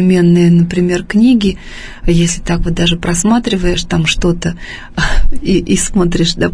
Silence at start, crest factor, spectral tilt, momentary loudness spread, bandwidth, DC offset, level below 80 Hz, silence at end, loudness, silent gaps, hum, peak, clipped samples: 0 s; 12 dB; -5 dB/octave; 9 LU; 10.5 kHz; under 0.1%; -20 dBFS; 0 s; -13 LUFS; none; none; 0 dBFS; under 0.1%